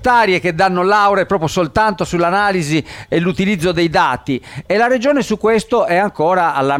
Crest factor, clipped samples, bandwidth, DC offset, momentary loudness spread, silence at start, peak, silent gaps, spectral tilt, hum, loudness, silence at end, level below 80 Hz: 12 dB; under 0.1%; 16 kHz; under 0.1%; 6 LU; 0 s; -2 dBFS; none; -5.5 dB/octave; none; -15 LUFS; 0 s; -42 dBFS